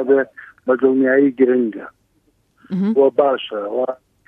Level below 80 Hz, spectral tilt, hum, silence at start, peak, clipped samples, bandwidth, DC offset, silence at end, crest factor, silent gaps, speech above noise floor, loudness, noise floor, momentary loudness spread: -68 dBFS; -9 dB/octave; none; 0 s; -2 dBFS; under 0.1%; 4.2 kHz; under 0.1%; 0.35 s; 16 dB; none; 45 dB; -17 LUFS; -62 dBFS; 13 LU